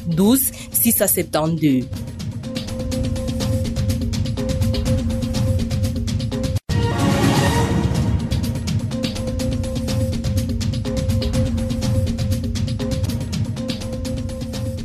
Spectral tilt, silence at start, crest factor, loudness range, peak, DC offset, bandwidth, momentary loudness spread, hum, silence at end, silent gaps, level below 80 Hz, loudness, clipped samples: -5.5 dB/octave; 0 s; 14 dB; 3 LU; -6 dBFS; under 0.1%; 14 kHz; 9 LU; none; 0 s; none; -30 dBFS; -21 LUFS; under 0.1%